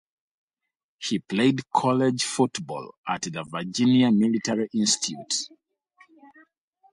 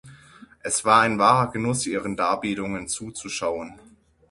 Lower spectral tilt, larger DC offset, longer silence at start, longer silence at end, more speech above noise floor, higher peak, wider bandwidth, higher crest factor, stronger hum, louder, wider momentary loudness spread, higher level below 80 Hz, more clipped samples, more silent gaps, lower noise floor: about the same, -4 dB/octave vs -4 dB/octave; neither; first, 1 s vs 0.05 s; first, 1.45 s vs 0.55 s; first, 63 dB vs 27 dB; second, -6 dBFS vs -2 dBFS; about the same, 11.5 kHz vs 11.5 kHz; about the same, 18 dB vs 22 dB; neither; about the same, -24 LUFS vs -23 LUFS; about the same, 12 LU vs 13 LU; second, -68 dBFS vs -56 dBFS; neither; first, 2.98-3.04 s vs none; first, -87 dBFS vs -50 dBFS